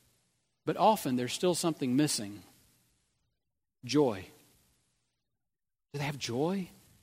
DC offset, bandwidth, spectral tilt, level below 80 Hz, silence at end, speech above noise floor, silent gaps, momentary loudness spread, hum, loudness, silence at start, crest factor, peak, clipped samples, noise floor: under 0.1%; 16 kHz; -4.5 dB/octave; -74 dBFS; 0.35 s; over 60 dB; none; 18 LU; none; -31 LUFS; 0.65 s; 22 dB; -12 dBFS; under 0.1%; under -90 dBFS